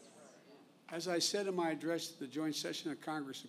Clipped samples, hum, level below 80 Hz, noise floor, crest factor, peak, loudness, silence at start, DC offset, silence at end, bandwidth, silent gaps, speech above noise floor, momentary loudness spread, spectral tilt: under 0.1%; none; under -90 dBFS; -62 dBFS; 18 dB; -22 dBFS; -38 LUFS; 0 s; under 0.1%; 0 s; 15.5 kHz; none; 23 dB; 9 LU; -3 dB/octave